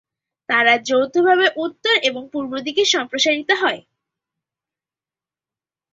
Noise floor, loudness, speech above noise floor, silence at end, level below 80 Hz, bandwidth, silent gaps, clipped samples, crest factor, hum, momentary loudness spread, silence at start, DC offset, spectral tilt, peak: under -90 dBFS; -17 LUFS; over 72 dB; 2.15 s; -68 dBFS; 7.8 kHz; none; under 0.1%; 20 dB; none; 9 LU; 0.5 s; under 0.1%; -1.5 dB/octave; 0 dBFS